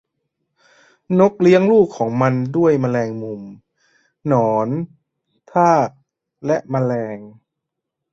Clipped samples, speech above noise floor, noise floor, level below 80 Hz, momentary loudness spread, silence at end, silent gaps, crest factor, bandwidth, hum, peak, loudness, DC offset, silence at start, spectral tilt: under 0.1%; 64 dB; -80 dBFS; -60 dBFS; 16 LU; 0.85 s; none; 18 dB; 7.8 kHz; none; -2 dBFS; -17 LUFS; under 0.1%; 1.1 s; -8 dB/octave